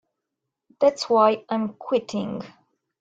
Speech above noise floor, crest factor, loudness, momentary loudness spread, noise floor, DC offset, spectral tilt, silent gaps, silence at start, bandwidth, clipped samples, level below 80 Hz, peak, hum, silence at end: 61 dB; 20 dB; -23 LUFS; 14 LU; -83 dBFS; under 0.1%; -5.5 dB/octave; none; 0.8 s; 9.2 kHz; under 0.1%; -70 dBFS; -6 dBFS; none; 0.55 s